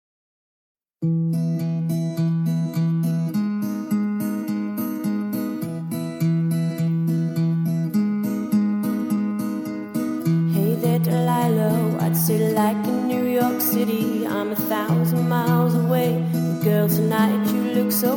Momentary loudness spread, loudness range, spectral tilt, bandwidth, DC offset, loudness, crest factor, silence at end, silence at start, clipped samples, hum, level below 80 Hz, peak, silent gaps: 6 LU; 4 LU; -7 dB/octave; 18 kHz; under 0.1%; -22 LUFS; 14 dB; 0 s; 1 s; under 0.1%; none; -66 dBFS; -6 dBFS; none